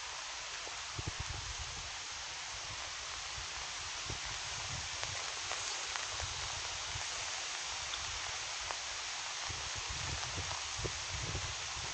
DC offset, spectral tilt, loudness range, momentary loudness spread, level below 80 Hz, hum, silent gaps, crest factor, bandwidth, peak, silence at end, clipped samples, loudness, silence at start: under 0.1%; -1 dB/octave; 3 LU; 3 LU; -54 dBFS; none; none; 26 dB; 9.2 kHz; -16 dBFS; 0 s; under 0.1%; -39 LUFS; 0 s